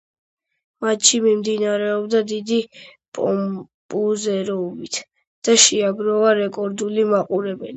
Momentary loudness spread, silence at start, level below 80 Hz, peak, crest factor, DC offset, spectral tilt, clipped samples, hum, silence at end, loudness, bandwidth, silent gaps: 14 LU; 0.8 s; -68 dBFS; 0 dBFS; 20 dB; under 0.1%; -2.5 dB/octave; under 0.1%; none; 0 s; -19 LUFS; 9 kHz; 3.08-3.12 s, 3.74-3.89 s, 5.27-5.42 s